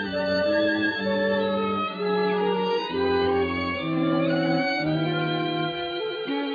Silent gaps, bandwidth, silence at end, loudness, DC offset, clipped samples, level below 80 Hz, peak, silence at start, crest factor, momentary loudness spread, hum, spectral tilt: none; 5 kHz; 0 s; -25 LUFS; under 0.1%; under 0.1%; -56 dBFS; -12 dBFS; 0 s; 12 dB; 5 LU; none; -7.5 dB/octave